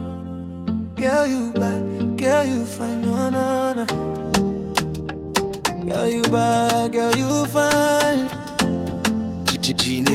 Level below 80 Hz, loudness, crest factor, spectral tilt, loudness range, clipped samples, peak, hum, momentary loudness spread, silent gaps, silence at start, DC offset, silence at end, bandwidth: -46 dBFS; -21 LUFS; 18 dB; -4.5 dB/octave; 3 LU; under 0.1%; -2 dBFS; none; 8 LU; none; 0 s; under 0.1%; 0 s; 16.5 kHz